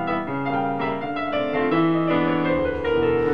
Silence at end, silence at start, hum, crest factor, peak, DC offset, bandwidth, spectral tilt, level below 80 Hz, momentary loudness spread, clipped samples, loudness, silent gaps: 0 s; 0 s; none; 12 dB; -10 dBFS; 0.9%; 5.8 kHz; -8.5 dB/octave; -48 dBFS; 5 LU; under 0.1%; -22 LUFS; none